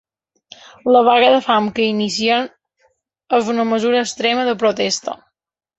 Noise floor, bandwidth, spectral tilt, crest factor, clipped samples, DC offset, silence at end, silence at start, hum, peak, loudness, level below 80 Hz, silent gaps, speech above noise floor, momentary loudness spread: -78 dBFS; 8.2 kHz; -3.5 dB/octave; 16 dB; under 0.1%; under 0.1%; 0.65 s; 0.85 s; none; -2 dBFS; -16 LUFS; -62 dBFS; none; 62 dB; 10 LU